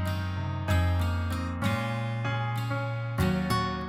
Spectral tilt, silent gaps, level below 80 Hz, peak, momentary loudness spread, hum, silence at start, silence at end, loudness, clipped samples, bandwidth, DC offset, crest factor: -6.5 dB/octave; none; -42 dBFS; -14 dBFS; 5 LU; none; 0 s; 0 s; -29 LUFS; under 0.1%; 16 kHz; under 0.1%; 14 dB